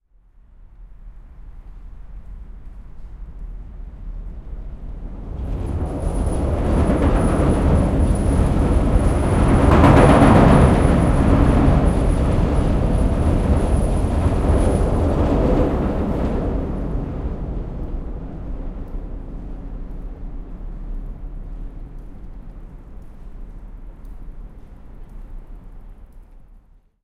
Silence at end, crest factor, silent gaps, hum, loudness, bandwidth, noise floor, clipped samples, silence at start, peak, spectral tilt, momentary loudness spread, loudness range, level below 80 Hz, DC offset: 0.5 s; 18 dB; none; none; -18 LUFS; 11 kHz; -50 dBFS; under 0.1%; 0.6 s; 0 dBFS; -8 dB/octave; 26 LU; 24 LU; -22 dBFS; under 0.1%